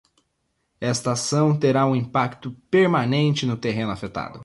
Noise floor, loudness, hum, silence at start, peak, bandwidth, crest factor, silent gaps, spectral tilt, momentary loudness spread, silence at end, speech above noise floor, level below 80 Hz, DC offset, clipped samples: -73 dBFS; -22 LUFS; none; 0.8 s; -8 dBFS; 11.5 kHz; 14 dB; none; -5.5 dB/octave; 10 LU; 0 s; 51 dB; -56 dBFS; under 0.1%; under 0.1%